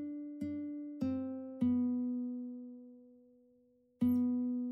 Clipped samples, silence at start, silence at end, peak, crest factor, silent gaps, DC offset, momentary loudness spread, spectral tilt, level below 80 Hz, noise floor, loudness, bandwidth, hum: under 0.1%; 0 s; 0 s; -22 dBFS; 16 dB; none; under 0.1%; 15 LU; -9.5 dB/octave; -74 dBFS; -70 dBFS; -37 LUFS; 13 kHz; none